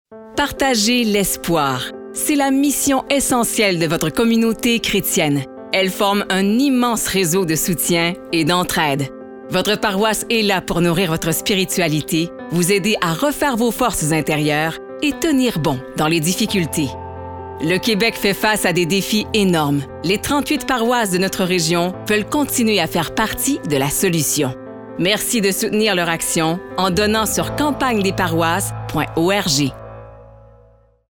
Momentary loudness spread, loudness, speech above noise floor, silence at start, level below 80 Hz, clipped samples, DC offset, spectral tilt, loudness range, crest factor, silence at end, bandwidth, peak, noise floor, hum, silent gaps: 6 LU; -17 LUFS; 33 dB; 0.1 s; -44 dBFS; under 0.1%; 0.2%; -4 dB/octave; 2 LU; 16 dB; 0.75 s; over 20 kHz; -2 dBFS; -51 dBFS; none; none